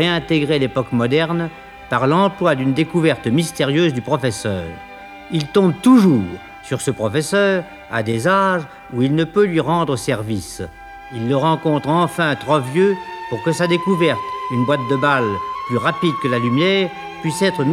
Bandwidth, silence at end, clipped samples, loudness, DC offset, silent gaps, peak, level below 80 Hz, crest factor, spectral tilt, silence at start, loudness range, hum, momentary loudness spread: 15 kHz; 0 s; under 0.1%; -18 LUFS; under 0.1%; none; -2 dBFS; -50 dBFS; 16 dB; -6 dB/octave; 0 s; 2 LU; none; 10 LU